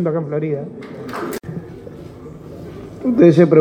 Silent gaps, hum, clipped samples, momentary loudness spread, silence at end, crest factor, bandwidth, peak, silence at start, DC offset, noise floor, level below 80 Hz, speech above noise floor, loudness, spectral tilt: none; none; under 0.1%; 24 LU; 0 s; 18 dB; 17.5 kHz; 0 dBFS; 0 s; under 0.1%; -35 dBFS; -50 dBFS; 21 dB; -17 LUFS; -8.5 dB/octave